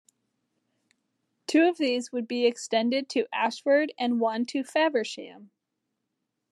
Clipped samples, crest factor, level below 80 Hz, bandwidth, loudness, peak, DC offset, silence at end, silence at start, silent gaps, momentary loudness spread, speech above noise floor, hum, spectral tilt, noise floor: under 0.1%; 18 dB; under -90 dBFS; 12 kHz; -26 LUFS; -10 dBFS; under 0.1%; 1.05 s; 1.5 s; none; 8 LU; 56 dB; none; -3.5 dB/octave; -82 dBFS